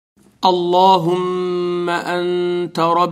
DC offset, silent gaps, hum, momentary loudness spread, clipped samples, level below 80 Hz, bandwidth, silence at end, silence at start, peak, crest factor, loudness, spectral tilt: under 0.1%; none; none; 7 LU; under 0.1%; -66 dBFS; 15 kHz; 0 s; 0.4 s; 0 dBFS; 16 dB; -17 LUFS; -6 dB/octave